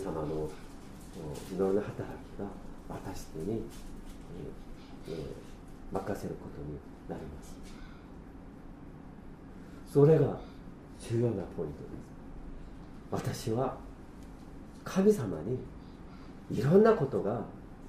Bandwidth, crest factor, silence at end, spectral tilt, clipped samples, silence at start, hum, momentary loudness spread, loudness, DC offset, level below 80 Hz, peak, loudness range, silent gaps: 15.5 kHz; 22 dB; 0 s; -7.5 dB/octave; under 0.1%; 0 s; none; 23 LU; -32 LUFS; under 0.1%; -50 dBFS; -12 dBFS; 13 LU; none